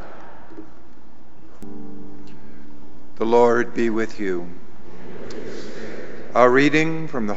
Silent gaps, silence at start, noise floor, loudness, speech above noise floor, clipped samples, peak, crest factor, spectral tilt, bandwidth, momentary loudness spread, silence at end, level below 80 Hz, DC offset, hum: none; 0 s; -49 dBFS; -19 LUFS; 31 dB; under 0.1%; 0 dBFS; 24 dB; -6 dB/octave; 8 kHz; 26 LU; 0 s; -54 dBFS; 8%; none